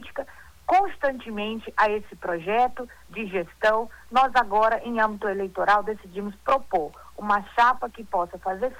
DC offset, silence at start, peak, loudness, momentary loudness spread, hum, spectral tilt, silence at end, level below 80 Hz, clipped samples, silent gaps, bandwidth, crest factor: under 0.1%; 0 s; -10 dBFS; -25 LUFS; 14 LU; none; -5 dB/octave; 0 s; -52 dBFS; under 0.1%; none; 19 kHz; 16 dB